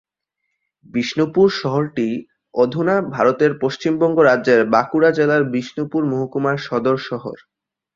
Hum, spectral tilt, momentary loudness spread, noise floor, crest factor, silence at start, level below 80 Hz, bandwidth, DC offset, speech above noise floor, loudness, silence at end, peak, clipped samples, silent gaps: none; -6.5 dB/octave; 9 LU; -76 dBFS; 16 dB; 0.95 s; -60 dBFS; 7.6 kHz; under 0.1%; 59 dB; -18 LUFS; 0.6 s; -2 dBFS; under 0.1%; none